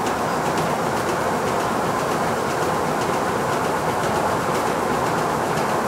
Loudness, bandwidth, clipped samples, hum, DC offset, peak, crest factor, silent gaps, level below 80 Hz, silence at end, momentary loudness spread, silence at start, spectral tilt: -22 LUFS; 16 kHz; under 0.1%; none; under 0.1%; -8 dBFS; 14 dB; none; -48 dBFS; 0 s; 1 LU; 0 s; -4.5 dB/octave